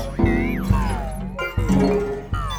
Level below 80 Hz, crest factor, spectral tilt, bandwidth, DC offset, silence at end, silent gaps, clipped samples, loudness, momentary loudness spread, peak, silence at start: -28 dBFS; 16 dB; -7 dB/octave; 16 kHz; under 0.1%; 0 s; none; under 0.1%; -22 LUFS; 9 LU; -4 dBFS; 0 s